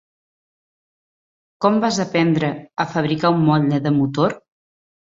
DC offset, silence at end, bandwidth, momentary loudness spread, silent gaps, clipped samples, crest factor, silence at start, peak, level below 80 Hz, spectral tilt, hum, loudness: under 0.1%; 0.65 s; 7.6 kHz; 7 LU; none; under 0.1%; 18 dB; 1.6 s; -2 dBFS; -58 dBFS; -6.5 dB/octave; none; -19 LUFS